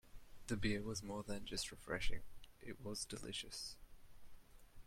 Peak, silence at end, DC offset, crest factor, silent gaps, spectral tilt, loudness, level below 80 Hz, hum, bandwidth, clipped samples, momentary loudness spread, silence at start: -26 dBFS; 0.05 s; under 0.1%; 20 dB; none; -3.5 dB/octave; -46 LUFS; -54 dBFS; none; 16 kHz; under 0.1%; 16 LU; 0.05 s